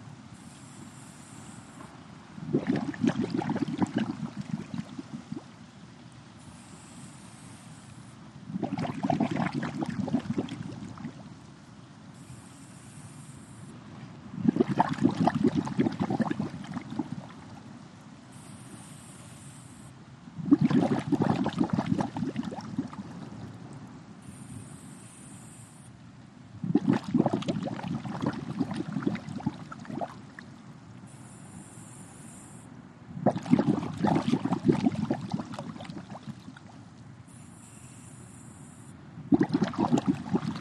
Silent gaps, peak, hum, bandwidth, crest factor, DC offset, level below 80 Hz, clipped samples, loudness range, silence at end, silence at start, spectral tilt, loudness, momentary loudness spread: none; -8 dBFS; none; 12 kHz; 24 dB; under 0.1%; -64 dBFS; under 0.1%; 16 LU; 0 s; 0 s; -7 dB/octave; -30 LUFS; 22 LU